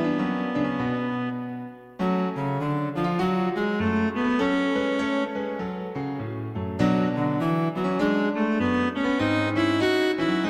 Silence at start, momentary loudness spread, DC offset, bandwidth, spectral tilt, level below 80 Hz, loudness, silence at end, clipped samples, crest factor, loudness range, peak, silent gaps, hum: 0 s; 8 LU; under 0.1%; 13 kHz; -7 dB/octave; -54 dBFS; -25 LUFS; 0 s; under 0.1%; 16 dB; 3 LU; -8 dBFS; none; none